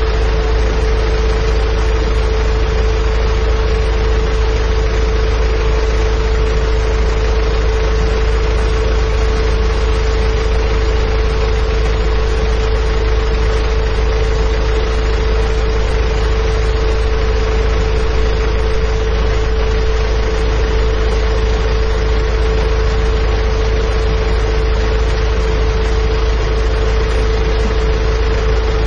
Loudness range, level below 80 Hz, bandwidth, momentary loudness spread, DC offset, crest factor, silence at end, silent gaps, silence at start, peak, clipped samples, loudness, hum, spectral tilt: 0 LU; -14 dBFS; 7.2 kHz; 1 LU; under 0.1%; 10 dB; 0 s; none; 0 s; -2 dBFS; under 0.1%; -16 LUFS; none; -6 dB/octave